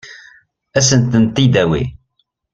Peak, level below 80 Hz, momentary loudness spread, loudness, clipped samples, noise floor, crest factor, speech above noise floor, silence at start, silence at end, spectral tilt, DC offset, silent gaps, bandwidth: 0 dBFS; -40 dBFS; 9 LU; -14 LUFS; under 0.1%; -66 dBFS; 16 dB; 54 dB; 0.05 s; 0.55 s; -5 dB/octave; under 0.1%; none; 9.2 kHz